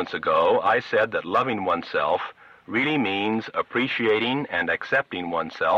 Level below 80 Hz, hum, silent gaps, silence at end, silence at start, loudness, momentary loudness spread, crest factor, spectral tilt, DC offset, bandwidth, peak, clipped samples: -64 dBFS; none; none; 0 s; 0 s; -23 LUFS; 7 LU; 14 dB; -6 dB/octave; under 0.1%; 7.8 kHz; -10 dBFS; under 0.1%